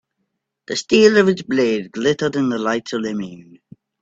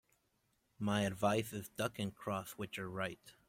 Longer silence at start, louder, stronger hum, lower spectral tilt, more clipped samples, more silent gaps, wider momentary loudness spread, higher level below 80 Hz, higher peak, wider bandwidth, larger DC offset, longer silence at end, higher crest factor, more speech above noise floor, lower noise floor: about the same, 0.7 s vs 0.8 s; first, -18 LUFS vs -39 LUFS; neither; about the same, -5 dB/octave vs -5 dB/octave; neither; neither; first, 13 LU vs 9 LU; first, -60 dBFS vs -70 dBFS; first, 0 dBFS vs -20 dBFS; second, 8 kHz vs 16.5 kHz; neither; first, 0.6 s vs 0.15 s; about the same, 18 dB vs 20 dB; first, 57 dB vs 40 dB; second, -74 dBFS vs -79 dBFS